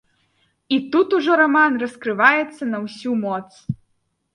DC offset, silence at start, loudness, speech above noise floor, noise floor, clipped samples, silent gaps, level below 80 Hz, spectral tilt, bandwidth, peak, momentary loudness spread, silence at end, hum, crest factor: under 0.1%; 0.7 s; -19 LUFS; 50 dB; -69 dBFS; under 0.1%; none; -60 dBFS; -6 dB/octave; 11 kHz; 0 dBFS; 15 LU; 0.6 s; none; 20 dB